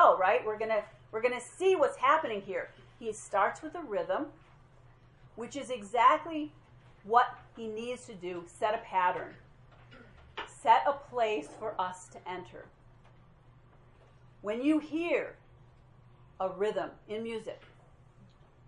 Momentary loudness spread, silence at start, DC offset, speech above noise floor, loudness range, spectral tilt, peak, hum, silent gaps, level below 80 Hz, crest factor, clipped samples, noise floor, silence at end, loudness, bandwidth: 18 LU; 0 s; under 0.1%; 27 dB; 7 LU; -4.5 dB/octave; -10 dBFS; none; none; -66 dBFS; 24 dB; under 0.1%; -59 dBFS; 1 s; -32 LUFS; 11.5 kHz